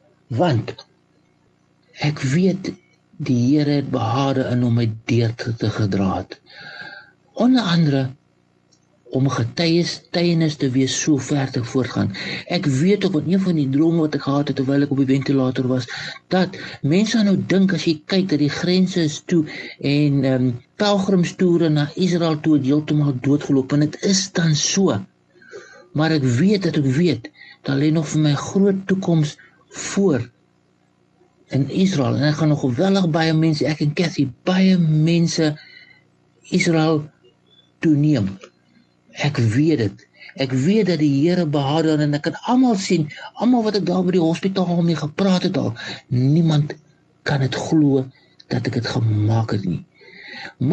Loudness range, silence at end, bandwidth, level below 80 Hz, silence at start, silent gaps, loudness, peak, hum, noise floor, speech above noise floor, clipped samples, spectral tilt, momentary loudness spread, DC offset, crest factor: 3 LU; 0 s; 8.8 kHz; -54 dBFS; 0.3 s; none; -19 LUFS; -4 dBFS; 60 Hz at -45 dBFS; -60 dBFS; 42 dB; under 0.1%; -6 dB/octave; 10 LU; under 0.1%; 16 dB